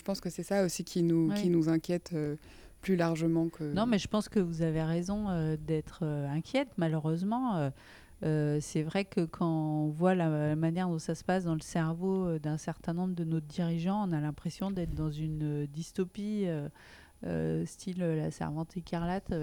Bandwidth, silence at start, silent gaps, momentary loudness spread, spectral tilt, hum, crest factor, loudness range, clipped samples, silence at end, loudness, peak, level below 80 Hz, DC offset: 17.5 kHz; 0.05 s; none; 8 LU; -7 dB/octave; none; 18 dB; 4 LU; under 0.1%; 0 s; -33 LUFS; -14 dBFS; -54 dBFS; under 0.1%